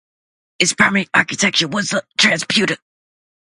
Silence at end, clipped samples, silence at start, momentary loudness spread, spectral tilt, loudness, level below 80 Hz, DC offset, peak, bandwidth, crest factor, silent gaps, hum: 0.7 s; under 0.1%; 0.6 s; 7 LU; -2.5 dB/octave; -15 LUFS; -60 dBFS; under 0.1%; 0 dBFS; 11.5 kHz; 18 dB; none; none